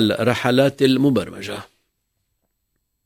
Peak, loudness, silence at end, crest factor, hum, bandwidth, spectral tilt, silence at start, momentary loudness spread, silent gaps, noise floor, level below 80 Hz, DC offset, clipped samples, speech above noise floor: -2 dBFS; -18 LUFS; 1.4 s; 18 dB; none; 16 kHz; -6 dB/octave; 0 s; 15 LU; none; -73 dBFS; -54 dBFS; under 0.1%; under 0.1%; 55 dB